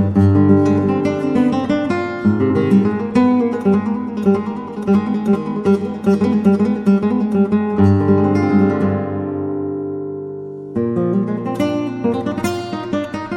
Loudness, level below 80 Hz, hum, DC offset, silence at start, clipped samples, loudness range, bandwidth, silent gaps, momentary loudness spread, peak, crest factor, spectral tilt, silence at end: -17 LUFS; -52 dBFS; none; under 0.1%; 0 s; under 0.1%; 6 LU; 11.5 kHz; none; 9 LU; 0 dBFS; 16 dB; -8.5 dB/octave; 0 s